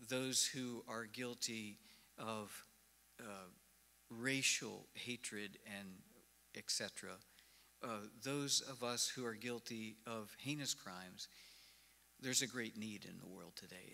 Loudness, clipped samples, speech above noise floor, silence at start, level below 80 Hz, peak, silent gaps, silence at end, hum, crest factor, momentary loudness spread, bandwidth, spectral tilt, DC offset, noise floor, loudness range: -43 LUFS; under 0.1%; 25 dB; 0 s; -84 dBFS; -20 dBFS; none; 0 s; none; 26 dB; 19 LU; 16 kHz; -2 dB/octave; under 0.1%; -71 dBFS; 5 LU